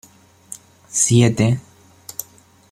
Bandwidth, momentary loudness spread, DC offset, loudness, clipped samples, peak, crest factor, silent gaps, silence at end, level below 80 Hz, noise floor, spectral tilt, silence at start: 15.5 kHz; 23 LU; under 0.1%; -17 LUFS; under 0.1%; -2 dBFS; 18 dB; none; 0.5 s; -54 dBFS; -49 dBFS; -5 dB/octave; 0.5 s